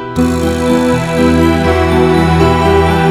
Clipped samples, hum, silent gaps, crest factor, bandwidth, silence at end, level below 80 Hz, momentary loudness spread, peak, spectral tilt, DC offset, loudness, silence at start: 0.2%; none; none; 10 dB; 15 kHz; 0 s; -24 dBFS; 3 LU; 0 dBFS; -6.5 dB/octave; 0.3%; -11 LUFS; 0 s